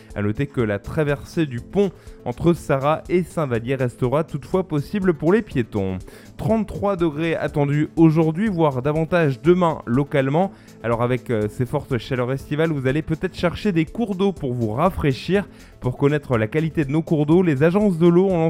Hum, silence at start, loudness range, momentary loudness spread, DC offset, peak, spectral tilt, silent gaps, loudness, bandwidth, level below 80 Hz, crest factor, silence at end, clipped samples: none; 0.1 s; 3 LU; 8 LU; under 0.1%; -2 dBFS; -8 dB/octave; none; -21 LUFS; 15.5 kHz; -44 dBFS; 18 dB; 0 s; under 0.1%